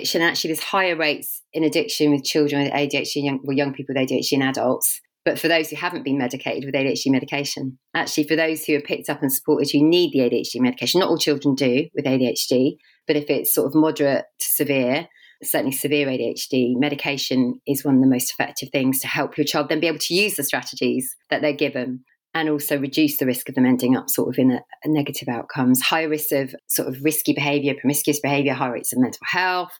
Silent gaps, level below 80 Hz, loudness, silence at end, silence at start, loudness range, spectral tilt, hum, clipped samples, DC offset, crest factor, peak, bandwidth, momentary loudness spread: none; -74 dBFS; -21 LUFS; 0.05 s; 0 s; 3 LU; -4 dB/octave; none; under 0.1%; under 0.1%; 18 dB; -2 dBFS; over 20 kHz; 6 LU